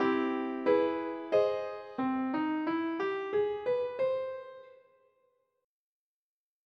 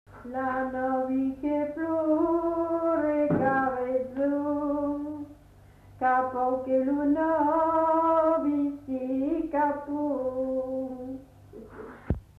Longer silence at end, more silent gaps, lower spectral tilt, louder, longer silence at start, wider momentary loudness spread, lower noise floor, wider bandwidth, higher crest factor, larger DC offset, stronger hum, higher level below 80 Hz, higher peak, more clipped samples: first, 2 s vs 0.2 s; neither; second, -6.5 dB/octave vs -9.5 dB/octave; second, -32 LUFS vs -27 LUFS; about the same, 0 s vs 0.1 s; second, 8 LU vs 12 LU; first, -74 dBFS vs -53 dBFS; first, 6.2 kHz vs 4.3 kHz; about the same, 18 dB vs 14 dB; neither; neither; second, -78 dBFS vs -50 dBFS; about the same, -16 dBFS vs -14 dBFS; neither